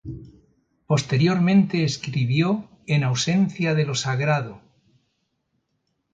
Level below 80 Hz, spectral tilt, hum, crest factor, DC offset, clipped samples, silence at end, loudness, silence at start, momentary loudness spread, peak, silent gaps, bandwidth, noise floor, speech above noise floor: -56 dBFS; -6 dB/octave; none; 14 dB; under 0.1%; under 0.1%; 1.55 s; -22 LUFS; 0.05 s; 7 LU; -8 dBFS; none; 9.2 kHz; -74 dBFS; 53 dB